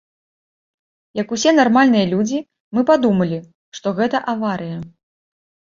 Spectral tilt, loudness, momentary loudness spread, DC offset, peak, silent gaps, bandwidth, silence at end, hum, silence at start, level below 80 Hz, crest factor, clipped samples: -5.5 dB/octave; -17 LUFS; 16 LU; under 0.1%; -2 dBFS; 2.60-2.71 s, 3.55-3.72 s; 7.6 kHz; 0.9 s; none; 1.15 s; -58 dBFS; 18 dB; under 0.1%